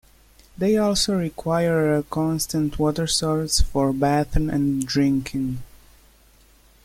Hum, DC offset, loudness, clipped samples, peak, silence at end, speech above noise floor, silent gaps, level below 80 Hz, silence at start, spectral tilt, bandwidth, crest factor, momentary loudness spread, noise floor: none; under 0.1%; -22 LUFS; under 0.1%; -6 dBFS; 1.2 s; 33 dB; none; -34 dBFS; 0.6 s; -5 dB/octave; 16.5 kHz; 16 dB; 5 LU; -54 dBFS